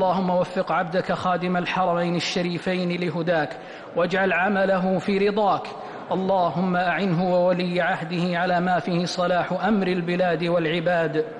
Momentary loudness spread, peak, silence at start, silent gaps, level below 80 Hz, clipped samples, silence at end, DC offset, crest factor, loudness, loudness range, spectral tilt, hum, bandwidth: 4 LU; -12 dBFS; 0 s; none; -58 dBFS; under 0.1%; 0 s; under 0.1%; 10 dB; -23 LUFS; 1 LU; -6.5 dB/octave; none; 10 kHz